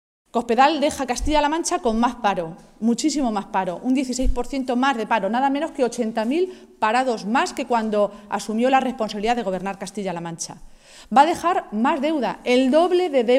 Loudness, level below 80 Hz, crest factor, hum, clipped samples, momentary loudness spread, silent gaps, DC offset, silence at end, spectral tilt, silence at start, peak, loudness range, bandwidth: -21 LUFS; -38 dBFS; 18 dB; none; under 0.1%; 10 LU; none; under 0.1%; 0 s; -4 dB/octave; 0.35 s; -2 dBFS; 2 LU; 14.5 kHz